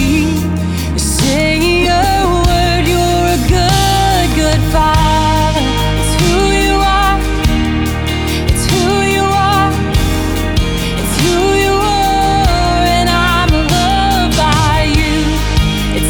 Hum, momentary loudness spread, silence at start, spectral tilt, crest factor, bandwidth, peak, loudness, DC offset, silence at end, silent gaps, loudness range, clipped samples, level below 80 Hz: none; 4 LU; 0 s; -4.5 dB/octave; 10 dB; over 20 kHz; 0 dBFS; -12 LUFS; under 0.1%; 0 s; none; 2 LU; under 0.1%; -18 dBFS